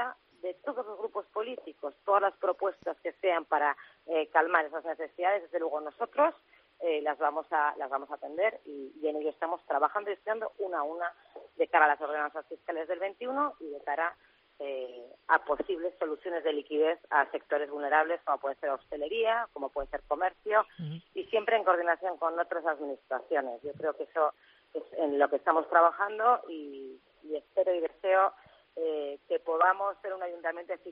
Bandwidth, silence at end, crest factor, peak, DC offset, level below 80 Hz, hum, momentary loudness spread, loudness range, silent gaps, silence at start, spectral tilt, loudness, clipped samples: 5.2 kHz; 0 s; 24 dB; -8 dBFS; under 0.1%; -68 dBFS; none; 13 LU; 4 LU; none; 0 s; -2 dB/octave; -31 LUFS; under 0.1%